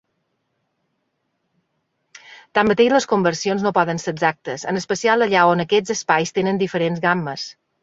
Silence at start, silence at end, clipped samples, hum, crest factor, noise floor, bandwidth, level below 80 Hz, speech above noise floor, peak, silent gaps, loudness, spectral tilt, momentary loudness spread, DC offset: 2.3 s; 0.3 s; under 0.1%; none; 20 dB; -72 dBFS; 7.8 kHz; -60 dBFS; 54 dB; -2 dBFS; none; -19 LUFS; -4.5 dB/octave; 9 LU; under 0.1%